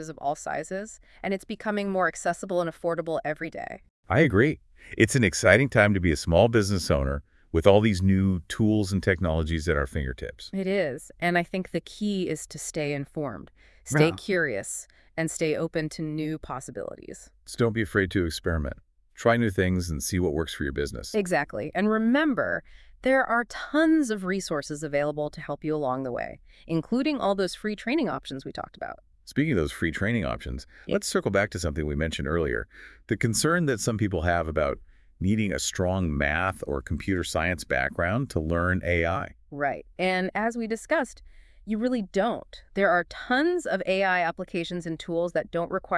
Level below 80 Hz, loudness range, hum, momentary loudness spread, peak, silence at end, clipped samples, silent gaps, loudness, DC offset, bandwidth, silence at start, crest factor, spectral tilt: -44 dBFS; 6 LU; none; 13 LU; -2 dBFS; 0 s; under 0.1%; 3.90-4.03 s; -26 LUFS; under 0.1%; 12 kHz; 0 s; 24 dB; -5.5 dB/octave